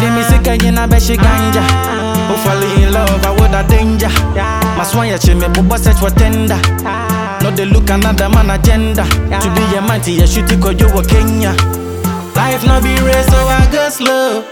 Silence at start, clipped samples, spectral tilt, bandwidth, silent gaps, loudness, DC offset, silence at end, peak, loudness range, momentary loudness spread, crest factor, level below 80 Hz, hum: 0 s; under 0.1%; -5.5 dB/octave; 19 kHz; none; -11 LUFS; under 0.1%; 0 s; 0 dBFS; 1 LU; 4 LU; 10 dB; -14 dBFS; none